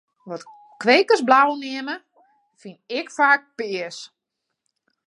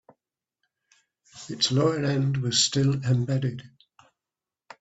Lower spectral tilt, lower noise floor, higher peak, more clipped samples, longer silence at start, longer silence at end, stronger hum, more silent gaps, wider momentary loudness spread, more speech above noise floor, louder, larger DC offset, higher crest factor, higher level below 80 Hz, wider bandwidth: second, -3 dB/octave vs -4.5 dB/octave; second, -81 dBFS vs under -90 dBFS; first, -2 dBFS vs -8 dBFS; neither; second, 0.25 s vs 1.35 s; second, 1 s vs 1.15 s; neither; neither; first, 20 LU vs 15 LU; second, 60 dB vs over 66 dB; first, -19 LUFS vs -24 LUFS; neither; about the same, 22 dB vs 20 dB; second, -78 dBFS vs -62 dBFS; first, 11.5 kHz vs 8.2 kHz